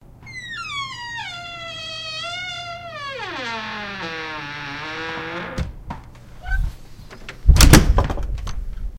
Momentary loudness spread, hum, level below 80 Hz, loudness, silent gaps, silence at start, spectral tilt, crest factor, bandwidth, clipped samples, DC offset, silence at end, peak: 20 LU; none; -24 dBFS; -22 LUFS; none; 0.1 s; -4 dB/octave; 22 dB; 16 kHz; under 0.1%; under 0.1%; 0 s; 0 dBFS